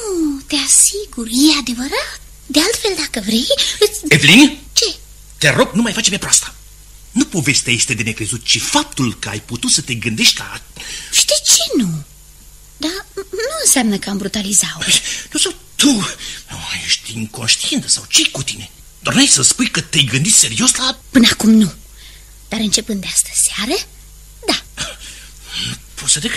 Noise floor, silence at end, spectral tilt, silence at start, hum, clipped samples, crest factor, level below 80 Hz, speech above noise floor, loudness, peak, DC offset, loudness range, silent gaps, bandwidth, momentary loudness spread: -40 dBFS; 0 s; -2 dB/octave; 0 s; none; 0.1%; 16 dB; -40 dBFS; 25 dB; -13 LUFS; 0 dBFS; under 0.1%; 5 LU; none; over 20 kHz; 15 LU